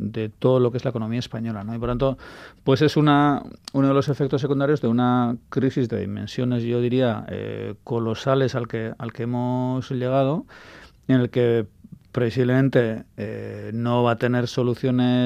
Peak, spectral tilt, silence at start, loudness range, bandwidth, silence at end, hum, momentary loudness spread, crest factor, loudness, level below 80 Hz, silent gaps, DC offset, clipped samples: -4 dBFS; -8 dB/octave; 0 s; 4 LU; 9.4 kHz; 0 s; none; 12 LU; 18 dB; -23 LUFS; -50 dBFS; none; under 0.1%; under 0.1%